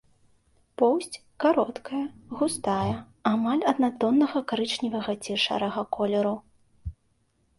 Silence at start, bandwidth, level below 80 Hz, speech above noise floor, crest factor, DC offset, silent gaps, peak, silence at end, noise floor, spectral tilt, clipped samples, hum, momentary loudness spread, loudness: 0.8 s; 11.5 kHz; -54 dBFS; 43 dB; 18 dB; under 0.1%; none; -8 dBFS; 0.65 s; -69 dBFS; -5 dB/octave; under 0.1%; none; 13 LU; -26 LUFS